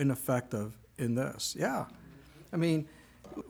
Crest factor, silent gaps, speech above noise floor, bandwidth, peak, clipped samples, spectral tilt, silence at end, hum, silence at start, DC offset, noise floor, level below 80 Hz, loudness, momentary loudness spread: 18 dB; none; 22 dB; over 20 kHz; -16 dBFS; under 0.1%; -5.5 dB/octave; 0 s; none; 0 s; under 0.1%; -54 dBFS; -64 dBFS; -34 LUFS; 15 LU